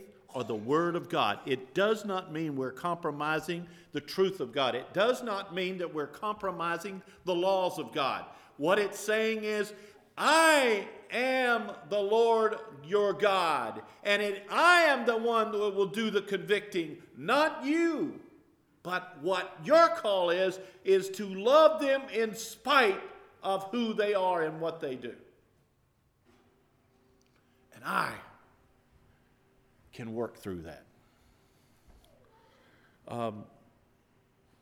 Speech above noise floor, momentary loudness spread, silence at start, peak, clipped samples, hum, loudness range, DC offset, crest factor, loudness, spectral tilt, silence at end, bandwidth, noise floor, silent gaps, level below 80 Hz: 41 dB; 16 LU; 0 s; -10 dBFS; under 0.1%; none; 18 LU; under 0.1%; 22 dB; -29 LUFS; -4 dB/octave; 1.15 s; 18 kHz; -71 dBFS; none; -74 dBFS